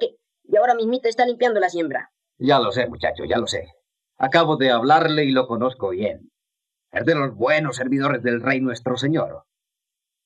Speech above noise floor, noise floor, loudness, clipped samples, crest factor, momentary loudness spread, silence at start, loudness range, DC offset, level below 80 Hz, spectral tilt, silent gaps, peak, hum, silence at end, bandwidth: 65 dB; -85 dBFS; -21 LUFS; under 0.1%; 20 dB; 10 LU; 0 s; 3 LU; under 0.1%; -60 dBFS; -5.5 dB/octave; none; -2 dBFS; none; 0.85 s; 10 kHz